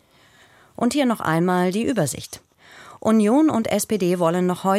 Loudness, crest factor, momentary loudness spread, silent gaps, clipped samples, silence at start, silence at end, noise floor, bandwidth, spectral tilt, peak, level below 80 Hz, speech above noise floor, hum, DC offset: -20 LUFS; 14 dB; 9 LU; none; under 0.1%; 0.8 s; 0 s; -54 dBFS; 15.5 kHz; -5.5 dB/octave; -6 dBFS; -58 dBFS; 34 dB; none; under 0.1%